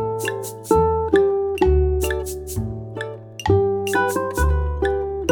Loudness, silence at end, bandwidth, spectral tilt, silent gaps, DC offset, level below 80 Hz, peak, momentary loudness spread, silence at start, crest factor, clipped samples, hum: -21 LUFS; 0 s; 19.5 kHz; -6 dB/octave; none; under 0.1%; -28 dBFS; -4 dBFS; 12 LU; 0 s; 16 dB; under 0.1%; none